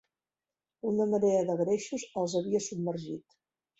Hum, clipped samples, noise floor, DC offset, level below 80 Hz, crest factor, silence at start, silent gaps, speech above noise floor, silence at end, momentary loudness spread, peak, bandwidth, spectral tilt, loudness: none; under 0.1%; under -90 dBFS; under 0.1%; -74 dBFS; 16 dB; 0.85 s; none; over 60 dB; 0.6 s; 12 LU; -16 dBFS; 8.2 kHz; -6 dB/octave; -31 LUFS